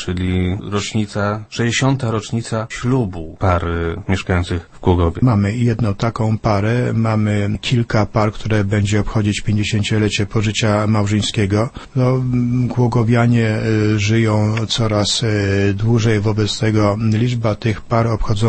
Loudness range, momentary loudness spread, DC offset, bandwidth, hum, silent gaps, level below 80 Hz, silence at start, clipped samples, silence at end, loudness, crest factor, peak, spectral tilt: 3 LU; 5 LU; under 0.1%; 8.8 kHz; none; none; -34 dBFS; 0 s; under 0.1%; 0 s; -17 LUFS; 16 dB; 0 dBFS; -6 dB/octave